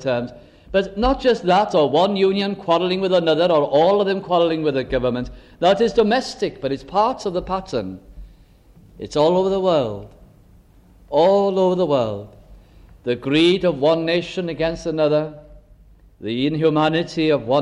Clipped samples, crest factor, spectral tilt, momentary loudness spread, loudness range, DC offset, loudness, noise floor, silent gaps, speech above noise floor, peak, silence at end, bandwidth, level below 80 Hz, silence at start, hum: under 0.1%; 16 dB; -6 dB/octave; 11 LU; 5 LU; under 0.1%; -19 LUFS; -50 dBFS; none; 31 dB; -4 dBFS; 0 s; 10.5 kHz; -44 dBFS; 0 s; none